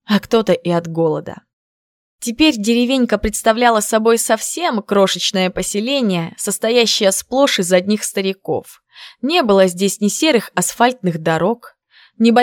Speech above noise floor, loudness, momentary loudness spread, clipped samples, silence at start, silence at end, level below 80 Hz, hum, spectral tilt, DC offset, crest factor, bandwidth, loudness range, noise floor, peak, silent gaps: over 74 dB; -16 LUFS; 7 LU; under 0.1%; 0.1 s; 0 s; -44 dBFS; none; -4 dB/octave; under 0.1%; 16 dB; 18 kHz; 2 LU; under -90 dBFS; 0 dBFS; 1.53-2.19 s